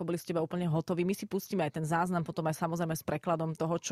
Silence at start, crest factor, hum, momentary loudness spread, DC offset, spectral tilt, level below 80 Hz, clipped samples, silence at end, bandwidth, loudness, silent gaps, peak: 0 s; 16 dB; none; 3 LU; under 0.1%; -6 dB/octave; -66 dBFS; under 0.1%; 0 s; 15.5 kHz; -33 LUFS; none; -16 dBFS